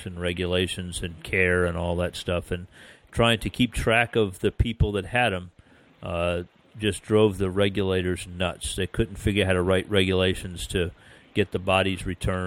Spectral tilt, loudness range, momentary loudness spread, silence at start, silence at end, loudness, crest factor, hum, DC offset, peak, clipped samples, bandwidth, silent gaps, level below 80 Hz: -5 dB/octave; 2 LU; 10 LU; 0 s; 0 s; -25 LUFS; 18 dB; none; under 0.1%; -6 dBFS; under 0.1%; 16 kHz; none; -40 dBFS